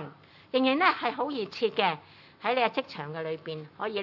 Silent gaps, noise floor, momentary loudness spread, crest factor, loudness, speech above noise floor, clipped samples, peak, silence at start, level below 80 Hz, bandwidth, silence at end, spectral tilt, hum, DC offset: none; -48 dBFS; 13 LU; 22 dB; -29 LUFS; 20 dB; under 0.1%; -8 dBFS; 0 s; -80 dBFS; 6 kHz; 0 s; -6 dB/octave; none; under 0.1%